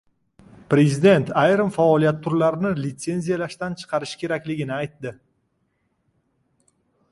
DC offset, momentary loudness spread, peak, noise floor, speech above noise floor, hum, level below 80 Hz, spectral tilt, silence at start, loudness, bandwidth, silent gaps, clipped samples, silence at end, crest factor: under 0.1%; 12 LU; -4 dBFS; -70 dBFS; 50 dB; none; -60 dBFS; -6.5 dB/octave; 0.7 s; -21 LUFS; 11.5 kHz; none; under 0.1%; 2 s; 18 dB